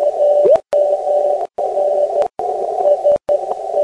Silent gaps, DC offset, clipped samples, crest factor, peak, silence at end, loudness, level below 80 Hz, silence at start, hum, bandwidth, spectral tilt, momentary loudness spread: none; under 0.1%; under 0.1%; 12 dB; -2 dBFS; 0 s; -16 LUFS; -56 dBFS; 0 s; none; 10 kHz; -5.5 dB/octave; 7 LU